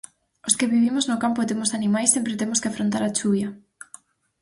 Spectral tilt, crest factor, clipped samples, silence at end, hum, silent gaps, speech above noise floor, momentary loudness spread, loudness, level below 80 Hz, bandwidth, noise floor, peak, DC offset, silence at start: -3.5 dB/octave; 20 dB; under 0.1%; 0.85 s; none; none; 28 dB; 13 LU; -22 LUFS; -64 dBFS; 11.5 kHz; -50 dBFS; -4 dBFS; under 0.1%; 0.45 s